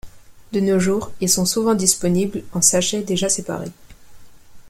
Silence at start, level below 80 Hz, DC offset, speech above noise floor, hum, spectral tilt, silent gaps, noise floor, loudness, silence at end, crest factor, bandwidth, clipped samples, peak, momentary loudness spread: 0.05 s; -48 dBFS; under 0.1%; 21 dB; none; -3.5 dB/octave; none; -40 dBFS; -18 LUFS; 0 s; 20 dB; 16.5 kHz; under 0.1%; -2 dBFS; 10 LU